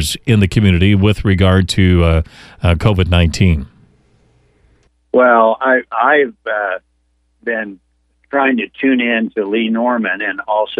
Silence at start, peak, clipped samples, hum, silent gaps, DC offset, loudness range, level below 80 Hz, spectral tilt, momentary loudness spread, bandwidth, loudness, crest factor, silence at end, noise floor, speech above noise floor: 0 s; 0 dBFS; under 0.1%; none; none; under 0.1%; 4 LU; -30 dBFS; -6.5 dB/octave; 9 LU; 14 kHz; -14 LUFS; 14 dB; 0.05 s; -61 dBFS; 47 dB